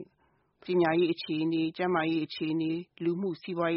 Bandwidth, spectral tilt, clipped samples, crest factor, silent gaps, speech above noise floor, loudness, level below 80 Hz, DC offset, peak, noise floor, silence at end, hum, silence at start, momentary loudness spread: 5.8 kHz; -5 dB/octave; under 0.1%; 16 dB; none; 41 dB; -30 LUFS; -72 dBFS; under 0.1%; -14 dBFS; -70 dBFS; 0 s; none; 0 s; 7 LU